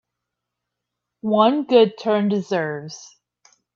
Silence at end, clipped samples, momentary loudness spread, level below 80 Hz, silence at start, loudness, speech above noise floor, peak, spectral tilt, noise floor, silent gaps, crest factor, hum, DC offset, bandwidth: 0.7 s; under 0.1%; 16 LU; -72 dBFS; 1.25 s; -19 LUFS; 63 dB; -2 dBFS; -6 dB/octave; -82 dBFS; none; 20 dB; 60 Hz at -50 dBFS; under 0.1%; 7.4 kHz